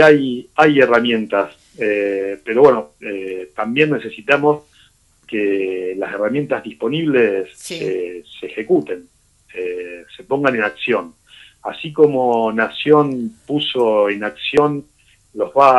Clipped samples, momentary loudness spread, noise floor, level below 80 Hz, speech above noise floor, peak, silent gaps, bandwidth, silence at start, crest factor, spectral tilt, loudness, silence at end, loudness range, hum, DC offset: under 0.1%; 15 LU; -53 dBFS; -58 dBFS; 37 dB; 0 dBFS; none; 11.5 kHz; 0 s; 16 dB; -6 dB/octave; -17 LUFS; 0 s; 5 LU; none; under 0.1%